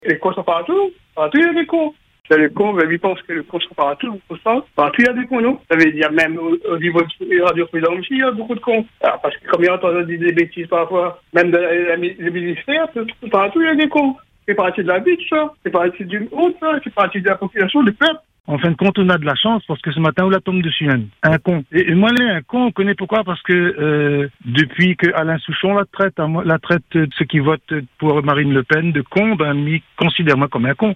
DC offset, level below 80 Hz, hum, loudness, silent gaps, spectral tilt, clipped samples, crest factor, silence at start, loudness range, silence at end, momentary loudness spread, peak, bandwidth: under 0.1%; -54 dBFS; none; -16 LUFS; 18.40-18.44 s; -7.5 dB/octave; under 0.1%; 16 dB; 0.05 s; 2 LU; 0 s; 6 LU; 0 dBFS; 8 kHz